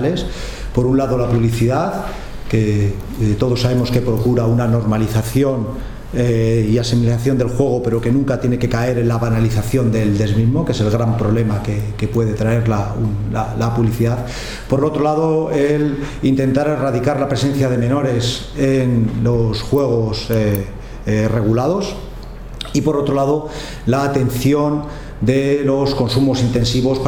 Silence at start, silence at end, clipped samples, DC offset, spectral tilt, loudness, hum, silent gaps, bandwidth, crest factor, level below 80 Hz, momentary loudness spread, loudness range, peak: 0 s; 0 s; under 0.1%; under 0.1%; -7 dB/octave; -17 LUFS; none; none; 17 kHz; 16 dB; -32 dBFS; 7 LU; 2 LU; 0 dBFS